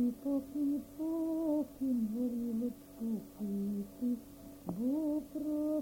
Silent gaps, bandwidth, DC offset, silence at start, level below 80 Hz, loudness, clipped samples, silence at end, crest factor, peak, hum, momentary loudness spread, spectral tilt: none; 17 kHz; under 0.1%; 0 s; -64 dBFS; -37 LUFS; under 0.1%; 0 s; 12 dB; -24 dBFS; none; 7 LU; -8 dB/octave